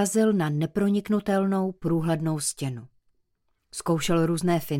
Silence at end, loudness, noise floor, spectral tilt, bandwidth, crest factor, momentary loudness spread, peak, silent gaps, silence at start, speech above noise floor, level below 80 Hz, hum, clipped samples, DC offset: 0 s; -25 LUFS; -73 dBFS; -5.5 dB/octave; 16.5 kHz; 14 dB; 10 LU; -12 dBFS; none; 0 s; 49 dB; -54 dBFS; none; under 0.1%; under 0.1%